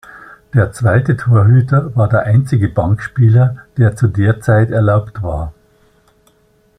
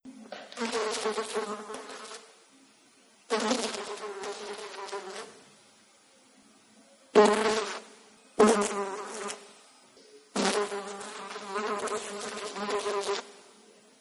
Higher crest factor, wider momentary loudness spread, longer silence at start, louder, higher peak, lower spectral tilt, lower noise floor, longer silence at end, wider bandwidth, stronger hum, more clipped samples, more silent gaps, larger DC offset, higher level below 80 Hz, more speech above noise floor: second, 12 dB vs 24 dB; second, 7 LU vs 20 LU; about the same, 0.15 s vs 0.05 s; first, -13 LUFS vs -30 LUFS; first, -2 dBFS vs -8 dBFS; first, -9 dB/octave vs -3 dB/octave; second, -54 dBFS vs -61 dBFS; first, 1.3 s vs 0.6 s; second, 10 kHz vs 12 kHz; neither; neither; neither; neither; first, -38 dBFS vs -74 dBFS; first, 42 dB vs 27 dB